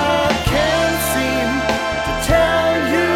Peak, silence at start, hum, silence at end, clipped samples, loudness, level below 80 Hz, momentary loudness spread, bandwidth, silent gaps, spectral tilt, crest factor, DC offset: 0 dBFS; 0 s; none; 0 s; under 0.1%; -17 LUFS; -30 dBFS; 4 LU; 17.5 kHz; none; -4 dB/octave; 16 dB; under 0.1%